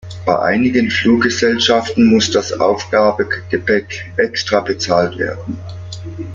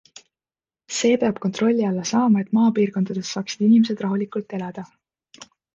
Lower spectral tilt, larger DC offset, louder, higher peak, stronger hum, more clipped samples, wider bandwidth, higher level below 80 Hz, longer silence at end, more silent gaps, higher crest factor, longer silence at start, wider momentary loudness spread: about the same, -4.5 dB/octave vs -5.5 dB/octave; neither; first, -15 LUFS vs -21 LUFS; first, -2 dBFS vs -8 dBFS; neither; neither; about the same, 7.6 kHz vs 7.8 kHz; first, -48 dBFS vs -66 dBFS; second, 0 s vs 0.3 s; neither; about the same, 14 dB vs 14 dB; second, 0.05 s vs 0.9 s; about the same, 14 LU vs 12 LU